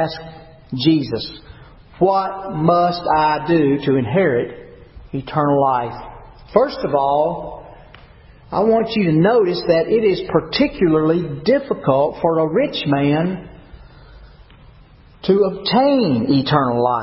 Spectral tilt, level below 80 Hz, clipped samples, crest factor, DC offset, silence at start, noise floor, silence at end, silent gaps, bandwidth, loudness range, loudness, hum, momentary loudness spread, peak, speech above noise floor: -11 dB/octave; -46 dBFS; under 0.1%; 18 dB; under 0.1%; 0 s; -46 dBFS; 0 s; none; 5.8 kHz; 4 LU; -17 LUFS; none; 14 LU; 0 dBFS; 29 dB